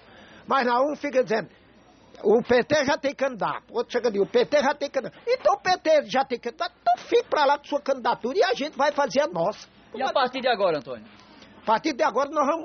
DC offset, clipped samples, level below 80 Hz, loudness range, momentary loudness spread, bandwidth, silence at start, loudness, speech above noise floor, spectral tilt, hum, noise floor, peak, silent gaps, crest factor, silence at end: under 0.1%; under 0.1%; -64 dBFS; 2 LU; 8 LU; 6.6 kHz; 0.35 s; -24 LUFS; 30 dB; -2 dB/octave; none; -54 dBFS; -10 dBFS; none; 16 dB; 0 s